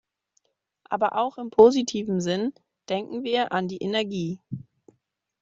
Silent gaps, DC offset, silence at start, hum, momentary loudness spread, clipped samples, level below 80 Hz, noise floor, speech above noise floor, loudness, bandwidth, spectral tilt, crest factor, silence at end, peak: none; under 0.1%; 0.9 s; none; 15 LU; under 0.1%; -66 dBFS; -74 dBFS; 50 dB; -24 LUFS; 7.8 kHz; -5.5 dB/octave; 22 dB; 0.8 s; -4 dBFS